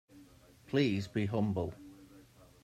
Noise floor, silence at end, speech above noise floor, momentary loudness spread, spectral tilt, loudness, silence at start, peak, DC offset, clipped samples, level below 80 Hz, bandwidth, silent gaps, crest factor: -59 dBFS; 0.4 s; 27 dB; 17 LU; -7 dB/octave; -34 LUFS; 0.15 s; -18 dBFS; under 0.1%; under 0.1%; -64 dBFS; 14 kHz; none; 18 dB